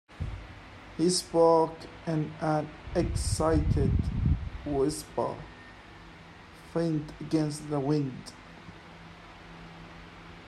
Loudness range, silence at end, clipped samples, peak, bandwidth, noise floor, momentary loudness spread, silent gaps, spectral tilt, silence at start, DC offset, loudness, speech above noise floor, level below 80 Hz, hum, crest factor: 6 LU; 0 s; under 0.1%; -10 dBFS; 13.5 kHz; -50 dBFS; 22 LU; none; -6 dB/octave; 0.1 s; under 0.1%; -29 LUFS; 22 dB; -40 dBFS; none; 20 dB